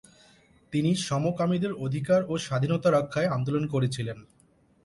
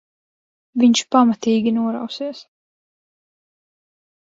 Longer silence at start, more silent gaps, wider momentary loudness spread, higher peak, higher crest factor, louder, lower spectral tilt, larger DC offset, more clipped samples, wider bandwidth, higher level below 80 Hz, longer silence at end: about the same, 0.7 s vs 0.75 s; neither; second, 7 LU vs 14 LU; second, -12 dBFS vs -2 dBFS; about the same, 16 dB vs 18 dB; second, -27 LUFS vs -18 LUFS; first, -6.5 dB/octave vs -4.5 dB/octave; neither; neither; first, 11.5 kHz vs 7.8 kHz; first, -60 dBFS vs -66 dBFS; second, 0.6 s vs 1.8 s